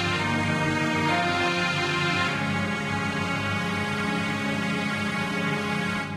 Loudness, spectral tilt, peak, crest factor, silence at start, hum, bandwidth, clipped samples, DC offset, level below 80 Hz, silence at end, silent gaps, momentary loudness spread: -25 LUFS; -5 dB/octave; -12 dBFS; 14 dB; 0 s; none; 14.5 kHz; under 0.1%; under 0.1%; -56 dBFS; 0 s; none; 3 LU